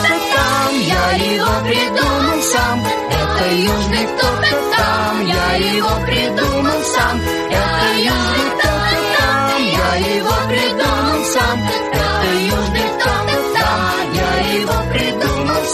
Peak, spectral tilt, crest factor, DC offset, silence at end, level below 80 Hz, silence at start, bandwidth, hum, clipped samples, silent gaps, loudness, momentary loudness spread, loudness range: -2 dBFS; -4 dB/octave; 14 dB; under 0.1%; 0 s; -28 dBFS; 0 s; 14 kHz; none; under 0.1%; none; -15 LUFS; 3 LU; 1 LU